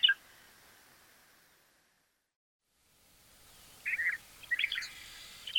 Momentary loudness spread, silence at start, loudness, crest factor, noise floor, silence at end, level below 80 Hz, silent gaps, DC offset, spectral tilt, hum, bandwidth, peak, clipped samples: 25 LU; 0 s; -34 LUFS; 26 dB; -75 dBFS; 0 s; -72 dBFS; 2.36-2.60 s; under 0.1%; 1.5 dB/octave; none; 17.5 kHz; -14 dBFS; under 0.1%